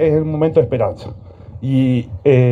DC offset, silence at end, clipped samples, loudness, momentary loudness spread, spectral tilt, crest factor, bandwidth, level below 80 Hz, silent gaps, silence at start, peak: under 0.1%; 0 s; under 0.1%; -16 LUFS; 19 LU; -10 dB/octave; 16 dB; 4.9 kHz; -42 dBFS; none; 0 s; 0 dBFS